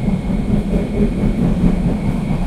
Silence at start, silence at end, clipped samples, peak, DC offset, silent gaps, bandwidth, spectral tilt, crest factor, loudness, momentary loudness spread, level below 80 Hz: 0 s; 0 s; under 0.1%; 0 dBFS; under 0.1%; none; 11.5 kHz; -9 dB/octave; 16 dB; -18 LUFS; 3 LU; -22 dBFS